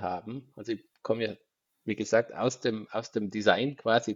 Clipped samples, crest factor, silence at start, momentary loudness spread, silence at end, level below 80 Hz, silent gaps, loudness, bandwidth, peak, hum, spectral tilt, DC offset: under 0.1%; 24 dB; 0 s; 13 LU; 0 s; -78 dBFS; none; -30 LUFS; 7.8 kHz; -6 dBFS; none; -4.5 dB/octave; under 0.1%